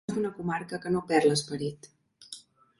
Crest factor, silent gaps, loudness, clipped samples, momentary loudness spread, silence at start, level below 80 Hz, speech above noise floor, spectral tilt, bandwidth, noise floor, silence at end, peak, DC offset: 20 dB; none; -29 LUFS; under 0.1%; 21 LU; 0.1 s; -66 dBFS; 21 dB; -5 dB/octave; 11.5 kHz; -50 dBFS; 0.4 s; -12 dBFS; under 0.1%